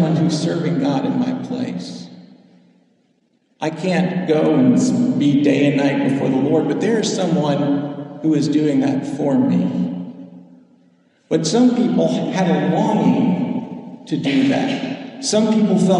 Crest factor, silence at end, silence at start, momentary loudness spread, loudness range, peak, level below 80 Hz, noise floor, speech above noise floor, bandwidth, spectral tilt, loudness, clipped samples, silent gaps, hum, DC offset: 14 dB; 0 s; 0 s; 11 LU; 6 LU; -4 dBFS; -64 dBFS; -62 dBFS; 45 dB; 10.5 kHz; -6.5 dB/octave; -18 LUFS; under 0.1%; none; none; under 0.1%